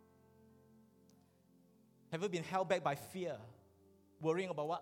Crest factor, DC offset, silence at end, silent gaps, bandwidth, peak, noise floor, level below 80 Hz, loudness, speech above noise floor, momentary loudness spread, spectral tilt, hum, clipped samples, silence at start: 20 dB; under 0.1%; 0 s; none; 17.5 kHz; -22 dBFS; -69 dBFS; -84 dBFS; -40 LUFS; 31 dB; 11 LU; -5.5 dB/octave; none; under 0.1%; 2.1 s